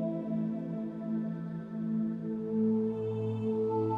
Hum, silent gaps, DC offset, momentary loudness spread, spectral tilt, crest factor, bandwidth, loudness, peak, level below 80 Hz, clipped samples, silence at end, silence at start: none; none; under 0.1%; 7 LU; -11 dB/octave; 12 dB; 3.8 kHz; -34 LUFS; -20 dBFS; -70 dBFS; under 0.1%; 0 s; 0 s